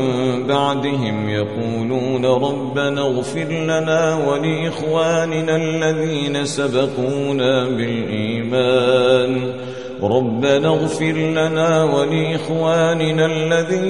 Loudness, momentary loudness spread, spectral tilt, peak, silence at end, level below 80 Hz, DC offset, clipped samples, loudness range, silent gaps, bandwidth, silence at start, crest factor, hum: -18 LUFS; 6 LU; -5.5 dB/octave; -2 dBFS; 0 s; -54 dBFS; 0.6%; under 0.1%; 2 LU; none; 11.5 kHz; 0 s; 16 dB; none